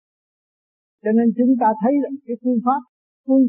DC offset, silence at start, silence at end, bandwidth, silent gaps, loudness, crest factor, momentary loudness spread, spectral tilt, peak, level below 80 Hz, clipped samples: under 0.1%; 1.05 s; 0 s; 2.9 kHz; 2.89-3.24 s; -19 LUFS; 14 dB; 10 LU; -4.5 dB/octave; -6 dBFS; -74 dBFS; under 0.1%